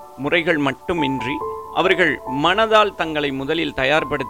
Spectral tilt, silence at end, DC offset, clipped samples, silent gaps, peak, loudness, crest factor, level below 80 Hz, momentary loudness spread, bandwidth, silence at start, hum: -5 dB/octave; 0 s; 0.3%; under 0.1%; none; -4 dBFS; -19 LUFS; 16 dB; -46 dBFS; 7 LU; 17 kHz; 0 s; none